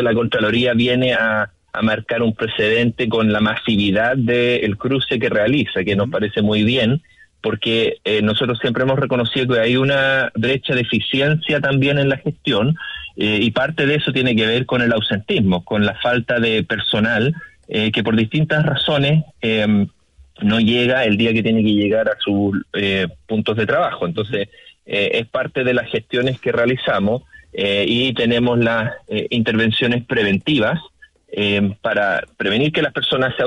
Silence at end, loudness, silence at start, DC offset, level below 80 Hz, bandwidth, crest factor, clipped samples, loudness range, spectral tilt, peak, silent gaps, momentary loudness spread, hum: 0 s; -17 LUFS; 0 s; under 0.1%; -50 dBFS; 10.5 kHz; 12 dB; under 0.1%; 2 LU; -7 dB/octave; -6 dBFS; none; 6 LU; none